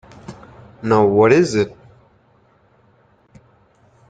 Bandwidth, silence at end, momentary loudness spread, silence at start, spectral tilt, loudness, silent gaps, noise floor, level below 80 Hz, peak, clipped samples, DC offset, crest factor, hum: 9.2 kHz; 2.4 s; 26 LU; 0.3 s; -6.5 dB/octave; -16 LUFS; none; -56 dBFS; -54 dBFS; 0 dBFS; under 0.1%; under 0.1%; 20 dB; none